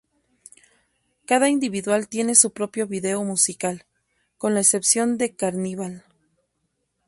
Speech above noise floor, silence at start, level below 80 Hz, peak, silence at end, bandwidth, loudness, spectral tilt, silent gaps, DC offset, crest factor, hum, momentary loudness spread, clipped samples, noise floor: 52 dB; 1.3 s; -68 dBFS; 0 dBFS; 1.1 s; 12 kHz; -20 LUFS; -3 dB/octave; none; under 0.1%; 24 dB; none; 13 LU; under 0.1%; -74 dBFS